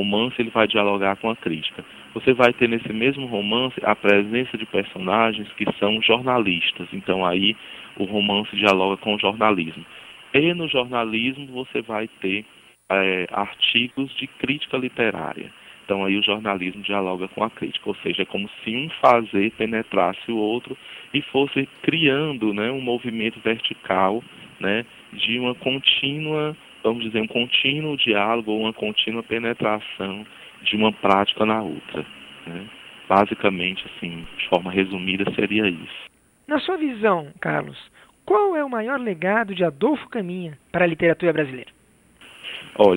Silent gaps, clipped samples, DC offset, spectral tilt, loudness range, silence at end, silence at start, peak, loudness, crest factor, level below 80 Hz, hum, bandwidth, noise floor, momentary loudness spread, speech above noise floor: none; under 0.1%; under 0.1%; -6 dB/octave; 3 LU; 0 s; 0 s; 0 dBFS; -22 LUFS; 22 dB; -60 dBFS; none; 16.5 kHz; -54 dBFS; 13 LU; 32 dB